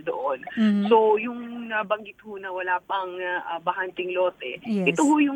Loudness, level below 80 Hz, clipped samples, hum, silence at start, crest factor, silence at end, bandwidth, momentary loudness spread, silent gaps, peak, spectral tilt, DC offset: -25 LUFS; -72 dBFS; under 0.1%; none; 0 s; 18 dB; 0 s; 17 kHz; 13 LU; none; -6 dBFS; -5.5 dB/octave; under 0.1%